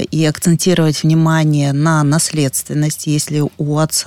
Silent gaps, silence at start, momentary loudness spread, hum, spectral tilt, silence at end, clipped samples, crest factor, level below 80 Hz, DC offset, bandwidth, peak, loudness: none; 0 s; 5 LU; none; -5 dB/octave; 0 s; under 0.1%; 10 dB; -50 dBFS; under 0.1%; 16.5 kHz; -4 dBFS; -14 LUFS